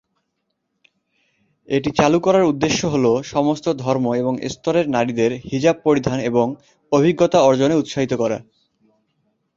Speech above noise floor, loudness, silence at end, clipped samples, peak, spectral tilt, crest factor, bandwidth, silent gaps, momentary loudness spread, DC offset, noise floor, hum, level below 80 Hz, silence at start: 56 dB; -18 LUFS; 1.15 s; under 0.1%; -2 dBFS; -6 dB/octave; 18 dB; 7.6 kHz; none; 7 LU; under 0.1%; -74 dBFS; none; -52 dBFS; 1.7 s